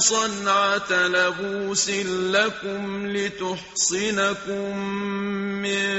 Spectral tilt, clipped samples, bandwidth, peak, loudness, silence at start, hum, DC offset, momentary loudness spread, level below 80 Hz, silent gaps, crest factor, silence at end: -2.5 dB/octave; under 0.1%; 8.2 kHz; -6 dBFS; -23 LUFS; 0 s; none; under 0.1%; 8 LU; -60 dBFS; none; 18 dB; 0 s